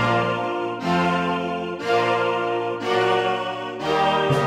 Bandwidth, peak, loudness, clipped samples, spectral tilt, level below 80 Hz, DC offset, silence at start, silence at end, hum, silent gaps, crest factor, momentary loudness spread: 15 kHz; -6 dBFS; -22 LUFS; under 0.1%; -6 dB/octave; -56 dBFS; under 0.1%; 0 s; 0 s; none; none; 14 dB; 6 LU